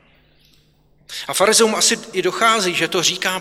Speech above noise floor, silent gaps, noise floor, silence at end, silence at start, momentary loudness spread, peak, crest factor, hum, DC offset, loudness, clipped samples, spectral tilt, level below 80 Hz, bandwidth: 38 dB; none; -56 dBFS; 0 s; 1.1 s; 10 LU; -2 dBFS; 16 dB; none; under 0.1%; -16 LUFS; under 0.1%; -1.5 dB/octave; -60 dBFS; 17 kHz